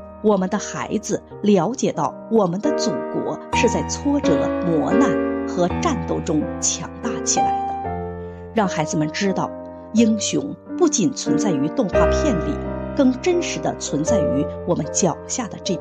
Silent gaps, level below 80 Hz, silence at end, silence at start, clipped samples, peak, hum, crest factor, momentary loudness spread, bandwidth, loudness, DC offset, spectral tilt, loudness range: none; -38 dBFS; 0 s; 0 s; under 0.1%; -4 dBFS; none; 16 dB; 8 LU; 9.8 kHz; -21 LUFS; under 0.1%; -4.5 dB/octave; 2 LU